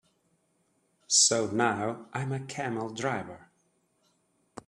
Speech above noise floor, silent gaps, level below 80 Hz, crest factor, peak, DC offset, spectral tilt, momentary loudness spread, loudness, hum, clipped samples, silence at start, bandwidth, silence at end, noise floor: 43 dB; none; -72 dBFS; 22 dB; -10 dBFS; under 0.1%; -2.5 dB/octave; 14 LU; -28 LUFS; none; under 0.1%; 1.1 s; 13 kHz; 1.25 s; -72 dBFS